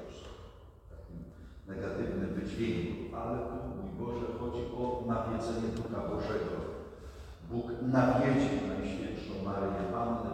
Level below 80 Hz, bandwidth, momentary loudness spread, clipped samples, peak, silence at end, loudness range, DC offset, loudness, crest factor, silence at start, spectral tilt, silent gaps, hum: -50 dBFS; 10.5 kHz; 20 LU; under 0.1%; -16 dBFS; 0 s; 5 LU; under 0.1%; -35 LUFS; 20 dB; 0 s; -7.5 dB/octave; none; none